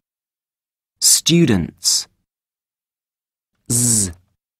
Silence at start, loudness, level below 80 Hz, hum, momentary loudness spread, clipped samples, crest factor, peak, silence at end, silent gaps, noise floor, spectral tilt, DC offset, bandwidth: 1 s; -15 LUFS; -48 dBFS; none; 8 LU; under 0.1%; 20 dB; 0 dBFS; 0.45 s; none; under -90 dBFS; -3 dB/octave; under 0.1%; 16 kHz